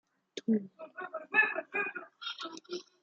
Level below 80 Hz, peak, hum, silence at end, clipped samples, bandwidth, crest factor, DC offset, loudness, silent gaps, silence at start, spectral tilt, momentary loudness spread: under -90 dBFS; -12 dBFS; none; 0.2 s; under 0.1%; 7.6 kHz; 24 dB; under 0.1%; -33 LUFS; none; 0.35 s; -4.5 dB/octave; 17 LU